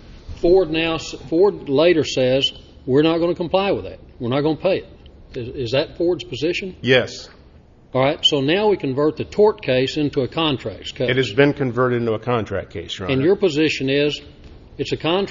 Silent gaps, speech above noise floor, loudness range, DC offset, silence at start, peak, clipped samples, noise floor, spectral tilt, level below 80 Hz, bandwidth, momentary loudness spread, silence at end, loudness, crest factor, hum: none; 28 dB; 4 LU; under 0.1%; 0.05 s; -2 dBFS; under 0.1%; -47 dBFS; -5.5 dB/octave; -44 dBFS; 7.6 kHz; 11 LU; 0 s; -19 LUFS; 18 dB; none